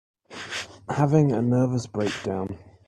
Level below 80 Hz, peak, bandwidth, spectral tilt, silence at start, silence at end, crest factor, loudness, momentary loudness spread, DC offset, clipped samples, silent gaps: -60 dBFS; -6 dBFS; 11 kHz; -7 dB/octave; 0.3 s; 0.2 s; 18 dB; -25 LUFS; 14 LU; under 0.1%; under 0.1%; none